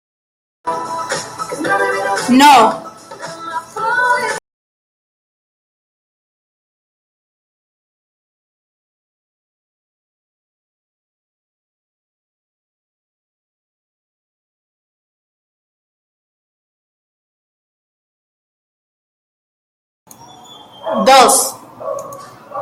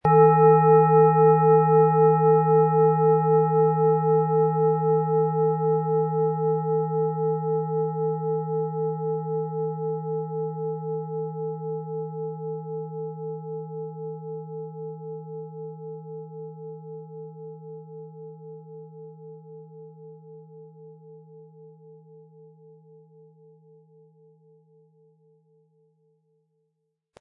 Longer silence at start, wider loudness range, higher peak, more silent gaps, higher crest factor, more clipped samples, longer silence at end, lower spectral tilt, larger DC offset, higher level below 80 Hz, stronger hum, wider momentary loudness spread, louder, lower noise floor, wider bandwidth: first, 0.65 s vs 0.05 s; second, 9 LU vs 24 LU; first, 0 dBFS vs -6 dBFS; first, 4.53-20.06 s vs none; about the same, 20 dB vs 18 dB; neither; second, 0 s vs 5.3 s; second, -2 dB/octave vs -13.5 dB/octave; neither; first, -64 dBFS vs -70 dBFS; neither; about the same, 22 LU vs 24 LU; first, -13 LUFS vs -22 LUFS; second, -39 dBFS vs -78 dBFS; first, 16.5 kHz vs 2.6 kHz